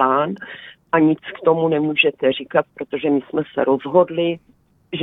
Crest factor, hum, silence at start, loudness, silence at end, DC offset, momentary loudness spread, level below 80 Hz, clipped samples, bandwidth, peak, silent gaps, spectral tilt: 18 dB; none; 0 s; -19 LUFS; 0 s; under 0.1%; 13 LU; -62 dBFS; under 0.1%; 4 kHz; -2 dBFS; none; -9 dB/octave